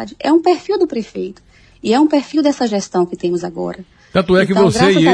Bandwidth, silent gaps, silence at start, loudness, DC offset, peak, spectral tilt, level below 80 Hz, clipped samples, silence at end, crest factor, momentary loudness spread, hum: 10.5 kHz; none; 0 s; -15 LUFS; under 0.1%; 0 dBFS; -5.5 dB/octave; -46 dBFS; under 0.1%; 0 s; 14 dB; 14 LU; none